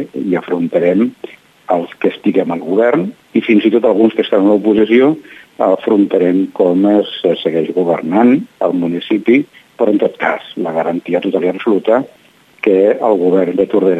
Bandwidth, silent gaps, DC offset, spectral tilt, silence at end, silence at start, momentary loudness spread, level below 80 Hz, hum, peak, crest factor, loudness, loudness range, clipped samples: 8 kHz; none; under 0.1%; -8 dB/octave; 0 s; 0 s; 7 LU; -62 dBFS; none; 0 dBFS; 12 dB; -13 LUFS; 3 LU; under 0.1%